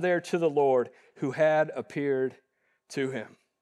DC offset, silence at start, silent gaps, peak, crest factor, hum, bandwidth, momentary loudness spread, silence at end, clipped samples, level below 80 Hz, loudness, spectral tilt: under 0.1%; 0 s; none; -12 dBFS; 16 dB; none; 12 kHz; 14 LU; 0.35 s; under 0.1%; -86 dBFS; -28 LUFS; -6 dB/octave